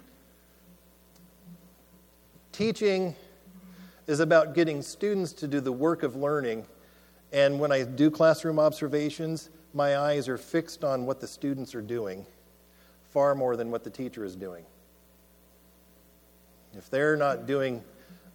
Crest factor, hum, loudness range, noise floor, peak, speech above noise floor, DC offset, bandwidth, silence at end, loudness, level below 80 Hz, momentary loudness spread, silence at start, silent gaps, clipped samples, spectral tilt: 22 dB; none; 8 LU; -59 dBFS; -8 dBFS; 32 dB; under 0.1%; 19.5 kHz; 0.2 s; -28 LUFS; -66 dBFS; 15 LU; 1.45 s; none; under 0.1%; -6 dB/octave